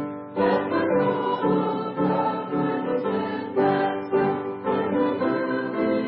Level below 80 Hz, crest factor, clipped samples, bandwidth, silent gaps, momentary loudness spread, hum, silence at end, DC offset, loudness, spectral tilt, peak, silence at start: -62 dBFS; 14 dB; under 0.1%; 5.6 kHz; none; 4 LU; none; 0 s; under 0.1%; -24 LUFS; -11.5 dB/octave; -10 dBFS; 0 s